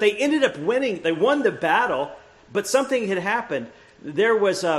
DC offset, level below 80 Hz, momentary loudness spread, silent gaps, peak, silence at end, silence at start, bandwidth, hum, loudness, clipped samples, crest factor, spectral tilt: under 0.1%; -64 dBFS; 10 LU; none; -4 dBFS; 0 s; 0 s; 13 kHz; none; -22 LUFS; under 0.1%; 18 dB; -4 dB/octave